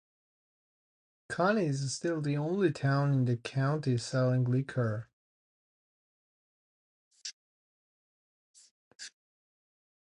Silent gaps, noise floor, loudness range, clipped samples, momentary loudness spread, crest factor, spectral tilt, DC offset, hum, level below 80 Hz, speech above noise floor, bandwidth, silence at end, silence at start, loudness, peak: 5.13-7.11 s, 7.33-8.54 s, 8.71-8.99 s; under -90 dBFS; 23 LU; under 0.1%; 16 LU; 20 dB; -6.5 dB/octave; under 0.1%; none; -72 dBFS; over 60 dB; 10.5 kHz; 1.1 s; 1.3 s; -31 LUFS; -14 dBFS